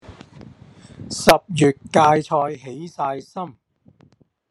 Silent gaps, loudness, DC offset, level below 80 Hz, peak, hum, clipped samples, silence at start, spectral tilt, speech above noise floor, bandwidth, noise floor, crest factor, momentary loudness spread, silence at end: none; -19 LUFS; under 0.1%; -52 dBFS; 0 dBFS; none; under 0.1%; 0.1 s; -5 dB/octave; 37 dB; 13.5 kHz; -56 dBFS; 22 dB; 18 LU; 1 s